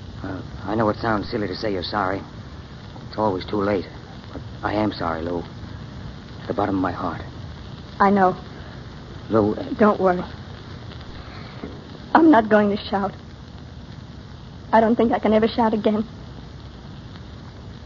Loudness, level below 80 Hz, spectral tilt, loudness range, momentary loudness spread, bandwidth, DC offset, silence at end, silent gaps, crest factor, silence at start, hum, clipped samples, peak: -21 LUFS; -44 dBFS; -7.5 dB/octave; 6 LU; 21 LU; 7.2 kHz; under 0.1%; 0 s; none; 22 dB; 0 s; none; under 0.1%; 0 dBFS